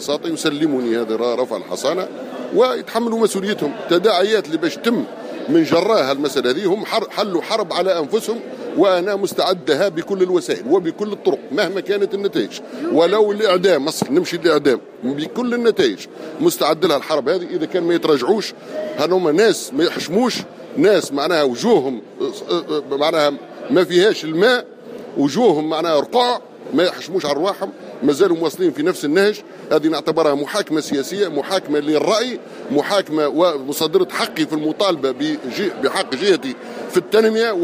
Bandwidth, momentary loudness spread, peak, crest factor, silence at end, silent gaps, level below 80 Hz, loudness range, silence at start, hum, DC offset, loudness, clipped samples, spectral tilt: 15.5 kHz; 8 LU; -2 dBFS; 16 dB; 0 s; none; -68 dBFS; 2 LU; 0 s; none; under 0.1%; -18 LUFS; under 0.1%; -4.5 dB/octave